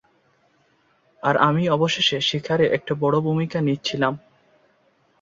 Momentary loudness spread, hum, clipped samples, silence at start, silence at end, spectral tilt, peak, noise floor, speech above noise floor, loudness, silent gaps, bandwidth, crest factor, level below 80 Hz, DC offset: 5 LU; none; under 0.1%; 1.25 s; 1.05 s; -5.5 dB/octave; -2 dBFS; -62 dBFS; 42 dB; -21 LUFS; none; 7.6 kHz; 20 dB; -60 dBFS; under 0.1%